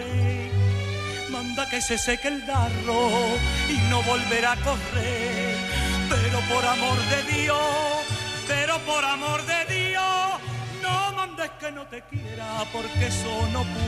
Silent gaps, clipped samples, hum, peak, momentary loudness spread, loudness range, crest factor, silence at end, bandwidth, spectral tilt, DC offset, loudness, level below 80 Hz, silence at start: none; under 0.1%; none; -10 dBFS; 8 LU; 4 LU; 16 dB; 0 s; 14.5 kHz; -4 dB/octave; under 0.1%; -24 LUFS; -38 dBFS; 0 s